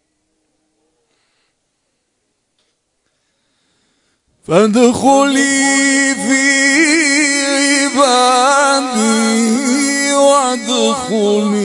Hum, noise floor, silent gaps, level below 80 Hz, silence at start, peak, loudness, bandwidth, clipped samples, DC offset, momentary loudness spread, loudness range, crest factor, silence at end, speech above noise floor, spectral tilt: none; -67 dBFS; none; -60 dBFS; 4.5 s; 0 dBFS; -11 LUFS; 11 kHz; under 0.1%; under 0.1%; 5 LU; 5 LU; 14 dB; 0 s; 55 dB; -2.5 dB/octave